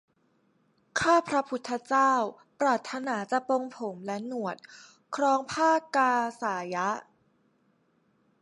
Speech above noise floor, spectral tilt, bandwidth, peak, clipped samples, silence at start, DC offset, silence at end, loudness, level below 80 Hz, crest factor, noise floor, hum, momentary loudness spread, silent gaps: 42 dB; -4 dB/octave; 11.5 kHz; -12 dBFS; under 0.1%; 0.95 s; under 0.1%; 1.4 s; -28 LUFS; -70 dBFS; 18 dB; -69 dBFS; none; 12 LU; none